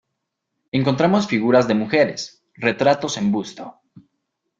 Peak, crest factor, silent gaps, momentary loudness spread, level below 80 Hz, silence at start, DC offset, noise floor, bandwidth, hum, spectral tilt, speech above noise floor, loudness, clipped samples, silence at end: -2 dBFS; 18 dB; none; 16 LU; -60 dBFS; 0.75 s; under 0.1%; -78 dBFS; 7.8 kHz; none; -5.5 dB/octave; 59 dB; -19 LUFS; under 0.1%; 0.9 s